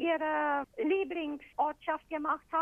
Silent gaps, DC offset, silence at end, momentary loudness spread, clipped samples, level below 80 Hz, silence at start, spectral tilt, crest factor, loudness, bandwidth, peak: none; under 0.1%; 0 s; 6 LU; under 0.1%; -68 dBFS; 0 s; -5.5 dB/octave; 14 dB; -33 LUFS; 3.9 kHz; -18 dBFS